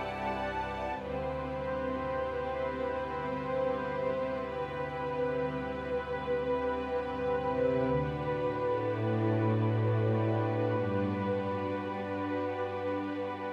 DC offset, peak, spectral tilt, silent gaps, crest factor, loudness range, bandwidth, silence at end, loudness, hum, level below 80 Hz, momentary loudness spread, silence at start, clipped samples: under 0.1%; -18 dBFS; -8.5 dB/octave; none; 14 dB; 4 LU; 7.2 kHz; 0 s; -33 LUFS; none; -54 dBFS; 6 LU; 0 s; under 0.1%